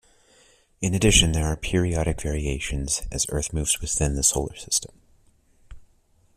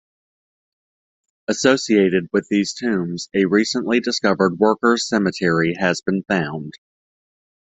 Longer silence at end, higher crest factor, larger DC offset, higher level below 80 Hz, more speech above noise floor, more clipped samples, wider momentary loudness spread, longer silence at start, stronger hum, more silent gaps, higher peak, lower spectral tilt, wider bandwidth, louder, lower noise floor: second, 0.55 s vs 1 s; first, 24 dB vs 18 dB; neither; first, -34 dBFS vs -60 dBFS; second, 37 dB vs over 71 dB; neither; first, 10 LU vs 7 LU; second, 0.8 s vs 1.5 s; neither; neither; about the same, -2 dBFS vs -2 dBFS; second, -3.5 dB/octave vs -5 dB/octave; first, 15.5 kHz vs 8.4 kHz; second, -23 LUFS vs -19 LUFS; second, -61 dBFS vs under -90 dBFS